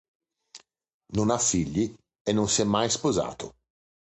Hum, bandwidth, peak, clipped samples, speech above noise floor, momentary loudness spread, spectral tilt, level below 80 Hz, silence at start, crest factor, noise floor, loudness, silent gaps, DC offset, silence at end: none; 9 kHz; -10 dBFS; under 0.1%; 28 dB; 11 LU; -4 dB/octave; -52 dBFS; 0.55 s; 18 dB; -54 dBFS; -26 LUFS; 0.94-1.00 s, 2.21-2.25 s; under 0.1%; 0.7 s